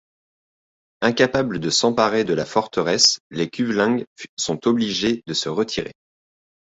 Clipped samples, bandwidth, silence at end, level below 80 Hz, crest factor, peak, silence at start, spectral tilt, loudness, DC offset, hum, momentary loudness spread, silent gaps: under 0.1%; 8 kHz; 0.85 s; -56 dBFS; 20 dB; -2 dBFS; 1 s; -3.5 dB/octave; -20 LUFS; under 0.1%; none; 10 LU; 3.20-3.30 s, 4.07-4.16 s, 4.29-4.37 s